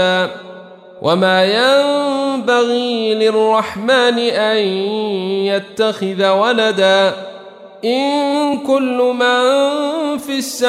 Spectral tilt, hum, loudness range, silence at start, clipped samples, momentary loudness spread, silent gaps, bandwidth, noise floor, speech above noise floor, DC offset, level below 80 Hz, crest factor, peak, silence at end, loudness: -4 dB/octave; none; 2 LU; 0 s; under 0.1%; 7 LU; none; 15.5 kHz; -36 dBFS; 21 dB; under 0.1%; -64 dBFS; 14 dB; -2 dBFS; 0 s; -15 LUFS